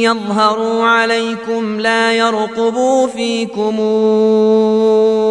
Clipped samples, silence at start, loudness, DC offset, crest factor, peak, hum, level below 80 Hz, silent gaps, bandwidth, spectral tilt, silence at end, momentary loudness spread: under 0.1%; 0 s; -13 LUFS; under 0.1%; 12 dB; 0 dBFS; none; -60 dBFS; none; 11 kHz; -4.5 dB/octave; 0 s; 6 LU